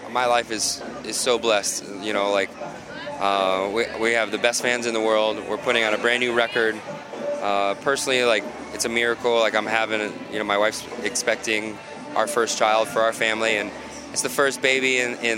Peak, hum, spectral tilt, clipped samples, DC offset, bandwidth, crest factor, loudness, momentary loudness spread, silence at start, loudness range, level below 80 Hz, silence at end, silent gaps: -2 dBFS; none; -2 dB/octave; under 0.1%; under 0.1%; 17 kHz; 20 dB; -22 LUFS; 9 LU; 0 s; 2 LU; -60 dBFS; 0 s; none